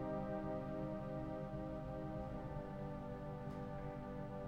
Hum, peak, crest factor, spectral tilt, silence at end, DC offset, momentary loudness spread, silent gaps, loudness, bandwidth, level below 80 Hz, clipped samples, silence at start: none; -32 dBFS; 12 dB; -9 dB/octave; 0 s; under 0.1%; 4 LU; none; -46 LUFS; 9.8 kHz; -56 dBFS; under 0.1%; 0 s